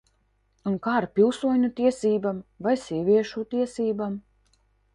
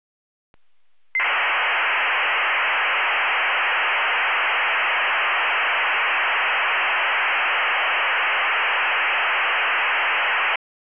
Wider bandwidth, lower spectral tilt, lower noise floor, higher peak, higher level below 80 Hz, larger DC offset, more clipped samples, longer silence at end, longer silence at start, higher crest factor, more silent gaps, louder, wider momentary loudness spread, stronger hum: first, 11 kHz vs 4 kHz; first, -6.5 dB/octave vs 6.5 dB/octave; second, -68 dBFS vs -74 dBFS; first, -8 dBFS vs -14 dBFS; first, -62 dBFS vs under -90 dBFS; second, under 0.1% vs 0.3%; neither; first, 0.75 s vs 0.45 s; second, 0.65 s vs 1.15 s; first, 16 dB vs 8 dB; neither; second, -25 LUFS vs -19 LUFS; first, 9 LU vs 0 LU; neither